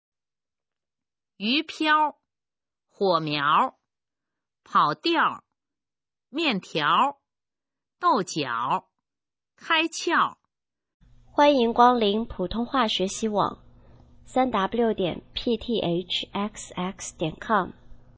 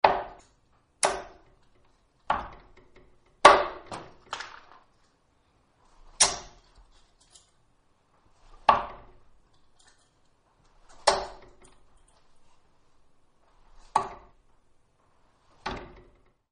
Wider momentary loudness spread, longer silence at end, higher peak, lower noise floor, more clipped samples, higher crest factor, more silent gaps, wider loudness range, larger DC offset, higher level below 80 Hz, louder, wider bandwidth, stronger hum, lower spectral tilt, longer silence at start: second, 11 LU vs 26 LU; second, 0.2 s vs 0.65 s; second, -4 dBFS vs 0 dBFS; first, under -90 dBFS vs -67 dBFS; neither; second, 22 dB vs 32 dB; first, 10.94-11.00 s vs none; second, 4 LU vs 13 LU; neither; about the same, -54 dBFS vs -56 dBFS; about the same, -24 LUFS vs -26 LUFS; second, 8 kHz vs 10.5 kHz; neither; first, -4 dB/octave vs -1 dB/octave; first, 1.4 s vs 0.05 s